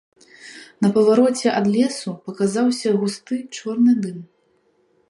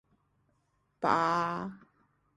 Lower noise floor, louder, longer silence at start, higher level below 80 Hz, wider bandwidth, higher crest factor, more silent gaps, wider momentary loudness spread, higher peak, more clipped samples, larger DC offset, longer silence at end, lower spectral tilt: second, -62 dBFS vs -75 dBFS; first, -19 LUFS vs -30 LUFS; second, 0.45 s vs 1 s; about the same, -68 dBFS vs -70 dBFS; about the same, 11.5 kHz vs 11.5 kHz; second, 16 dB vs 24 dB; neither; first, 16 LU vs 12 LU; first, -4 dBFS vs -10 dBFS; neither; neither; first, 0.85 s vs 0.6 s; about the same, -5.5 dB/octave vs -5.5 dB/octave